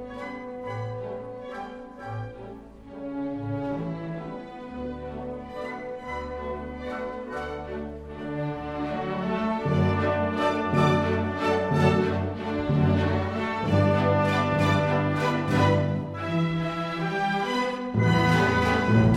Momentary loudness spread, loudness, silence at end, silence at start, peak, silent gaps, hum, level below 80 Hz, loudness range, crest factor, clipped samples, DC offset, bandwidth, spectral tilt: 14 LU; -26 LUFS; 0 s; 0 s; -8 dBFS; none; none; -48 dBFS; 11 LU; 18 dB; under 0.1%; under 0.1%; 12.5 kHz; -7 dB/octave